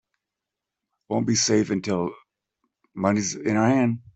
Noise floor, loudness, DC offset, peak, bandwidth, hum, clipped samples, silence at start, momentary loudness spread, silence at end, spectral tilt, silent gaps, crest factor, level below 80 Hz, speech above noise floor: -86 dBFS; -23 LUFS; under 0.1%; -6 dBFS; 8.4 kHz; none; under 0.1%; 1.1 s; 9 LU; 0.15 s; -4.5 dB/octave; none; 18 dB; -62 dBFS; 63 dB